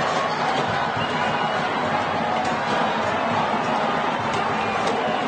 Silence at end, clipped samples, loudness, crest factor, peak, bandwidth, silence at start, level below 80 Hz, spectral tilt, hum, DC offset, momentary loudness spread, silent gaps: 0 s; under 0.1%; -22 LUFS; 12 dB; -10 dBFS; 9.4 kHz; 0 s; -56 dBFS; -4.5 dB/octave; none; under 0.1%; 1 LU; none